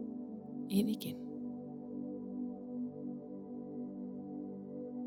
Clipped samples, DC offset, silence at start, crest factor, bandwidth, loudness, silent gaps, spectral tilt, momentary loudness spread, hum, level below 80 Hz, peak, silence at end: under 0.1%; under 0.1%; 0 s; 22 dB; 16.5 kHz; -42 LUFS; none; -7 dB/octave; 11 LU; 50 Hz at -65 dBFS; -78 dBFS; -20 dBFS; 0 s